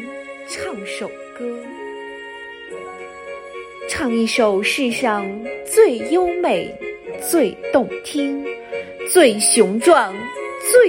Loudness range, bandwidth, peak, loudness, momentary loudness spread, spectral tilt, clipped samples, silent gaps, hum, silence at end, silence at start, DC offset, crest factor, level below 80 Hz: 13 LU; 16.5 kHz; 0 dBFS; -18 LUFS; 19 LU; -3 dB/octave; under 0.1%; none; none; 0 s; 0 s; under 0.1%; 18 dB; -56 dBFS